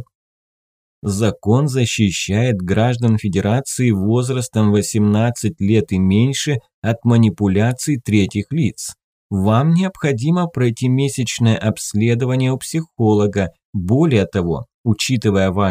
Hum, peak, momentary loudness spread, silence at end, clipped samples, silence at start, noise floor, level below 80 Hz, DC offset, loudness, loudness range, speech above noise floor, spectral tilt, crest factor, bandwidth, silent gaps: none; -2 dBFS; 7 LU; 0 s; under 0.1%; 0 s; under -90 dBFS; -48 dBFS; under 0.1%; -17 LUFS; 1 LU; over 74 dB; -6 dB/octave; 14 dB; 16 kHz; 0.15-1.02 s, 6.74-6.82 s, 9.04-9.30 s, 13.65-13.73 s, 14.74-14.84 s